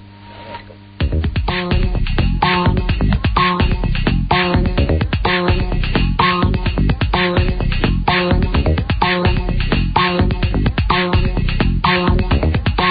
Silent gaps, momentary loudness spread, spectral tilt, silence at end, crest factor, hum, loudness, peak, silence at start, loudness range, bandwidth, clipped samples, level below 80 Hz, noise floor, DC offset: none; 4 LU; -12 dB/octave; 0 s; 14 dB; none; -17 LUFS; 0 dBFS; 0 s; 1 LU; 5.2 kHz; under 0.1%; -20 dBFS; -36 dBFS; under 0.1%